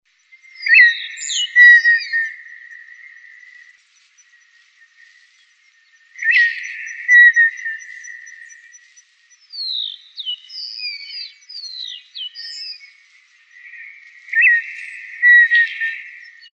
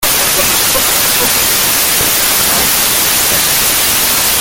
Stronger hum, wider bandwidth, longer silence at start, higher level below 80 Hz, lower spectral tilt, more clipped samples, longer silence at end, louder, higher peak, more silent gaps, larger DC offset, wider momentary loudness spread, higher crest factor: neither; second, 8.2 kHz vs over 20 kHz; first, 0.6 s vs 0 s; second, under -90 dBFS vs -34 dBFS; second, 13.5 dB/octave vs 0 dB/octave; neither; first, 0.45 s vs 0 s; second, -12 LUFS vs -8 LUFS; about the same, 0 dBFS vs 0 dBFS; neither; neither; first, 25 LU vs 0 LU; first, 18 dB vs 12 dB